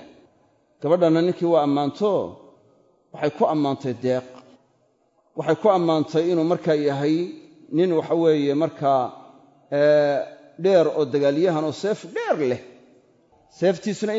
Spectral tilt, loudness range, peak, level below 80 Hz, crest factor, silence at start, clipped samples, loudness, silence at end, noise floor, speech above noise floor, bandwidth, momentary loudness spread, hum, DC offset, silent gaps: -7 dB/octave; 4 LU; -6 dBFS; -72 dBFS; 16 dB; 0 s; under 0.1%; -22 LUFS; 0 s; -64 dBFS; 44 dB; 7.8 kHz; 9 LU; none; under 0.1%; none